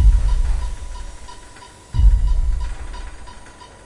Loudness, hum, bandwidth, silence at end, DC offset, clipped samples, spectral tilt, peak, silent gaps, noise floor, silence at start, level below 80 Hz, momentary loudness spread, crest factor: -22 LUFS; none; 10.5 kHz; 0.35 s; under 0.1%; under 0.1%; -6 dB/octave; -2 dBFS; none; -41 dBFS; 0 s; -18 dBFS; 23 LU; 16 dB